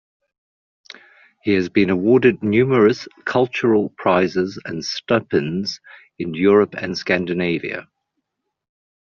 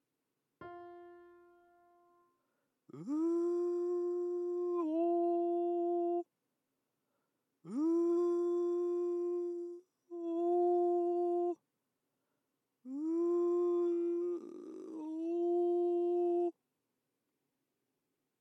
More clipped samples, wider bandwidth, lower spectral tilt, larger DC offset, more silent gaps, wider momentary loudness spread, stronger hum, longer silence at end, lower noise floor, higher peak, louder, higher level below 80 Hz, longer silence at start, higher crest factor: neither; first, 7.2 kHz vs 6 kHz; second, -5 dB/octave vs -8 dB/octave; neither; neither; second, 12 LU vs 16 LU; neither; second, 1.3 s vs 1.9 s; second, -77 dBFS vs -86 dBFS; first, -2 dBFS vs -26 dBFS; first, -19 LUFS vs -35 LUFS; first, -58 dBFS vs under -90 dBFS; first, 1.45 s vs 0.6 s; first, 18 dB vs 12 dB